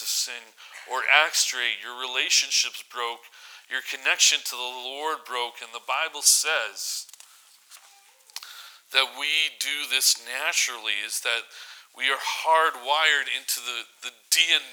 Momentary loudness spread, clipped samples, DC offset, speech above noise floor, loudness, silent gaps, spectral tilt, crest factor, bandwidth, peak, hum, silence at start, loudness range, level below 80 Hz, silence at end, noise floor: 20 LU; under 0.1%; under 0.1%; 29 dB; -23 LUFS; none; 4.5 dB/octave; 26 dB; over 20 kHz; 0 dBFS; none; 0 s; 3 LU; under -90 dBFS; 0 s; -55 dBFS